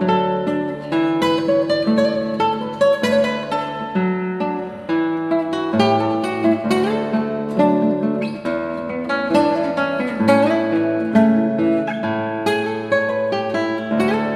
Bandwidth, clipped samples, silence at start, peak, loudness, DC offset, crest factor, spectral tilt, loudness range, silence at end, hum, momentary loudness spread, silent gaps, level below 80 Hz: 12.5 kHz; under 0.1%; 0 s; -2 dBFS; -19 LUFS; under 0.1%; 16 dB; -6.5 dB/octave; 2 LU; 0 s; none; 7 LU; none; -58 dBFS